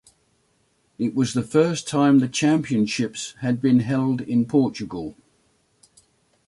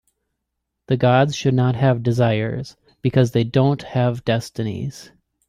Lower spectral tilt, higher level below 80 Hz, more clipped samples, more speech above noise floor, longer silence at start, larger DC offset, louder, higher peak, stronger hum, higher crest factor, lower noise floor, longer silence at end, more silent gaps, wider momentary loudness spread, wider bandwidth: about the same, -6 dB/octave vs -7 dB/octave; second, -60 dBFS vs -52 dBFS; neither; second, 45 dB vs 60 dB; about the same, 1 s vs 0.9 s; neither; about the same, -21 LUFS vs -19 LUFS; about the same, -6 dBFS vs -4 dBFS; neither; about the same, 16 dB vs 16 dB; second, -66 dBFS vs -78 dBFS; first, 1.35 s vs 0.45 s; neither; about the same, 10 LU vs 10 LU; about the same, 11.5 kHz vs 11.5 kHz